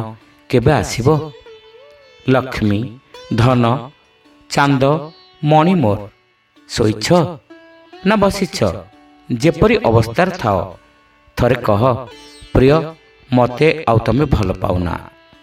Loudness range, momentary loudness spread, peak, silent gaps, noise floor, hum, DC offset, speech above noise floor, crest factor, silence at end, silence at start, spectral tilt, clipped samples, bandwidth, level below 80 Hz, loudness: 3 LU; 13 LU; 0 dBFS; none; -53 dBFS; none; under 0.1%; 38 dB; 16 dB; 0.35 s; 0 s; -6.5 dB/octave; under 0.1%; 15 kHz; -34 dBFS; -16 LUFS